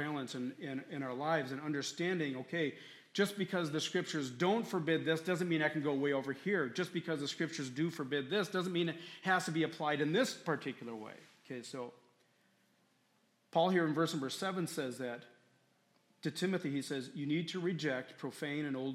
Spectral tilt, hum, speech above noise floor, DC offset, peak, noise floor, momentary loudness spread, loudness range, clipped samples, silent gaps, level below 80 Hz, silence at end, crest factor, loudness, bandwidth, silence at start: -5 dB/octave; none; 38 dB; under 0.1%; -18 dBFS; -74 dBFS; 11 LU; 5 LU; under 0.1%; none; -86 dBFS; 0 s; 20 dB; -37 LUFS; 16 kHz; 0 s